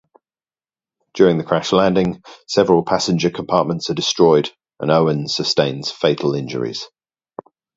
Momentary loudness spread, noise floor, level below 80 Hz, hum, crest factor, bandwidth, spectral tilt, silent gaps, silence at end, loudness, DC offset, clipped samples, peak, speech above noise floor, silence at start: 11 LU; under -90 dBFS; -54 dBFS; none; 18 dB; 7.8 kHz; -5 dB/octave; none; 0.9 s; -17 LUFS; under 0.1%; under 0.1%; 0 dBFS; over 73 dB; 1.15 s